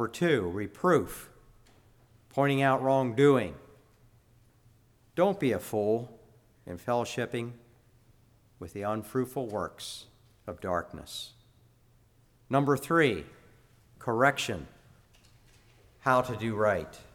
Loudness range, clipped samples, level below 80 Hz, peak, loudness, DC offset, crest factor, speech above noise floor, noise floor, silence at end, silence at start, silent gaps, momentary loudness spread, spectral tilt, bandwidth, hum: 8 LU; under 0.1%; -60 dBFS; -8 dBFS; -29 LUFS; under 0.1%; 22 dB; 35 dB; -63 dBFS; 0.1 s; 0 s; none; 19 LU; -6 dB/octave; 18.5 kHz; none